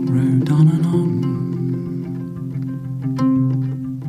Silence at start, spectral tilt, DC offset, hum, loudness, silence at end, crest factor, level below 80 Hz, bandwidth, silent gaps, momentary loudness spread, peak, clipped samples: 0 s; -9.5 dB/octave; under 0.1%; none; -19 LUFS; 0 s; 14 dB; -50 dBFS; 10 kHz; none; 12 LU; -4 dBFS; under 0.1%